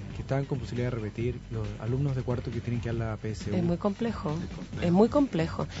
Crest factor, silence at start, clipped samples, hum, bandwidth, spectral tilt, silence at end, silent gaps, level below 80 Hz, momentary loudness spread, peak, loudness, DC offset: 20 dB; 0 s; under 0.1%; none; 8 kHz; -8 dB/octave; 0 s; none; -46 dBFS; 10 LU; -10 dBFS; -30 LUFS; under 0.1%